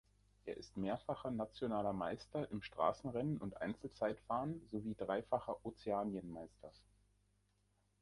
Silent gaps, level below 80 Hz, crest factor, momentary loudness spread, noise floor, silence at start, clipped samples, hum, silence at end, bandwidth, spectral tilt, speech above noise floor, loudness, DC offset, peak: none; -68 dBFS; 22 dB; 11 LU; -79 dBFS; 0.45 s; under 0.1%; 50 Hz at -65 dBFS; 1.25 s; 11.5 kHz; -7.5 dB/octave; 36 dB; -43 LUFS; under 0.1%; -22 dBFS